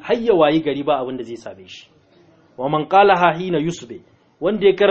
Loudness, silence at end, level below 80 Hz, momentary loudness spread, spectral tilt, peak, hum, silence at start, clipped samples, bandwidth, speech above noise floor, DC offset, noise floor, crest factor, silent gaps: -17 LUFS; 0 s; -54 dBFS; 21 LU; -6 dB/octave; 0 dBFS; none; 0.05 s; under 0.1%; 8 kHz; 35 dB; under 0.1%; -53 dBFS; 18 dB; none